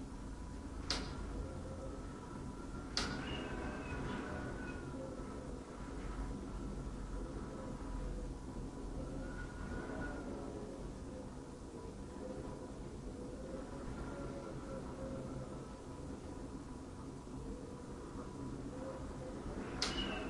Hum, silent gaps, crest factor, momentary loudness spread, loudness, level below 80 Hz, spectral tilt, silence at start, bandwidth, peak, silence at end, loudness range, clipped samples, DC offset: none; none; 24 dB; 8 LU; -46 LUFS; -50 dBFS; -5 dB/octave; 0 s; 11.5 kHz; -20 dBFS; 0 s; 5 LU; under 0.1%; under 0.1%